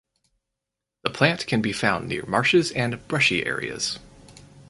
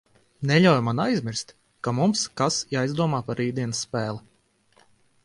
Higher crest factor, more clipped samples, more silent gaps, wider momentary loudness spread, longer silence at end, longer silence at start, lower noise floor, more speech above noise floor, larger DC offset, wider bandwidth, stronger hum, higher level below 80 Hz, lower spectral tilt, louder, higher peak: about the same, 24 dB vs 20 dB; neither; neither; second, 9 LU vs 13 LU; second, 0.05 s vs 1.05 s; first, 1.05 s vs 0.4 s; first, -85 dBFS vs -63 dBFS; first, 62 dB vs 40 dB; neither; about the same, 11.5 kHz vs 11.5 kHz; neither; first, -54 dBFS vs -62 dBFS; about the same, -4.5 dB/octave vs -5 dB/octave; about the same, -23 LUFS vs -24 LUFS; first, -2 dBFS vs -6 dBFS